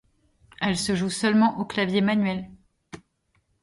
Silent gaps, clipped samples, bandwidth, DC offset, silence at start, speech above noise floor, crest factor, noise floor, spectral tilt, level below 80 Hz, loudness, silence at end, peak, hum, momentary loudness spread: none; under 0.1%; 11.5 kHz; under 0.1%; 0.6 s; 47 dB; 16 dB; -70 dBFS; -5 dB/octave; -58 dBFS; -24 LUFS; 0.65 s; -10 dBFS; none; 9 LU